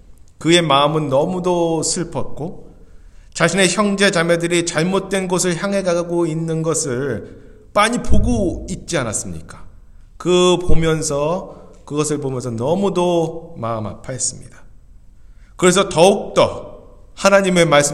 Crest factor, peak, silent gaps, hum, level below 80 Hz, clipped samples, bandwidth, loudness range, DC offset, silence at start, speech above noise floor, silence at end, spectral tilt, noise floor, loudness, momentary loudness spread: 18 dB; 0 dBFS; none; none; -32 dBFS; under 0.1%; 13.5 kHz; 4 LU; under 0.1%; 0.1 s; 25 dB; 0 s; -4 dB/octave; -42 dBFS; -17 LUFS; 13 LU